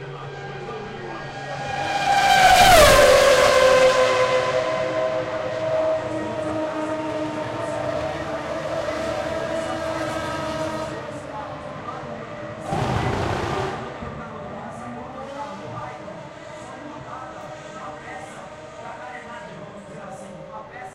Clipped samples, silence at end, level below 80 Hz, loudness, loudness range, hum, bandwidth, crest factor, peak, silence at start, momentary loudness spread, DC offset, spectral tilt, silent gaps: under 0.1%; 0 s; -42 dBFS; -20 LUFS; 21 LU; none; 16 kHz; 20 dB; -2 dBFS; 0 s; 22 LU; under 0.1%; -3.5 dB/octave; none